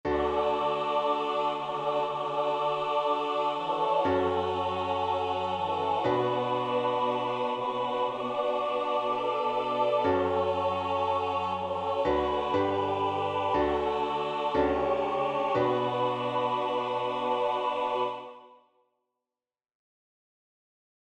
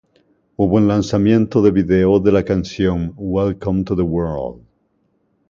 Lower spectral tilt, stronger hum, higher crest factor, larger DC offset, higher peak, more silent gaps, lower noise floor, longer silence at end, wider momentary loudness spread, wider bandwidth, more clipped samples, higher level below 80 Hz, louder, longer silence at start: second, -6 dB/octave vs -8 dB/octave; neither; about the same, 14 dB vs 16 dB; neither; second, -14 dBFS vs 0 dBFS; neither; first, -90 dBFS vs -64 dBFS; first, 2.5 s vs 0.9 s; second, 3 LU vs 8 LU; first, 9.4 kHz vs 7.6 kHz; neither; second, -58 dBFS vs -38 dBFS; second, -29 LUFS vs -17 LUFS; second, 0.05 s vs 0.6 s